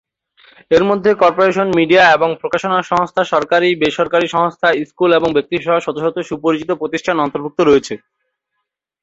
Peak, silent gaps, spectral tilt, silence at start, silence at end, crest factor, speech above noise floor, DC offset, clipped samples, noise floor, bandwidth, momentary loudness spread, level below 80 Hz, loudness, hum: 0 dBFS; none; -5.5 dB/octave; 0.7 s; 1.05 s; 14 dB; 61 dB; under 0.1%; under 0.1%; -75 dBFS; 8 kHz; 8 LU; -52 dBFS; -14 LUFS; none